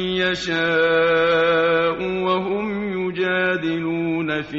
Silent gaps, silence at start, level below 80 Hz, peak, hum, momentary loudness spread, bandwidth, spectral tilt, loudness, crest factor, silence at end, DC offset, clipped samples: none; 0 s; -52 dBFS; -6 dBFS; none; 7 LU; 7.6 kHz; -3 dB/octave; -20 LUFS; 14 dB; 0 s; under 0.1%; under 0.1%